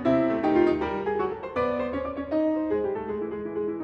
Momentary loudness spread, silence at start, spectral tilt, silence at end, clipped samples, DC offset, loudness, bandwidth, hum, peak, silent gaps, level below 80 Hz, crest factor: 9 LU; 0 s; -8.5 dB/octave; 0 s; under 0.1%; under 0.1%; -27 LUFS; 6.6 kHz; none; -10 dBFS; none; -52 dBFS; 16 dB